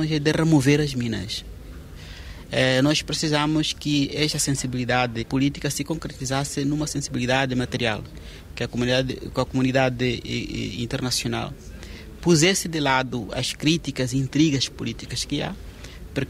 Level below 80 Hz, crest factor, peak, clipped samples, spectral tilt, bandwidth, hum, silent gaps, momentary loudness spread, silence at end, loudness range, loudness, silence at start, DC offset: -42 dBFS; 20 dB; -4 dBFS; under 0.1%; -4.5 dB/octave; 16 kHz; none; none; 19 LU; 0 s; 3 LU; -23 LUFS; 0 s; under 0.1%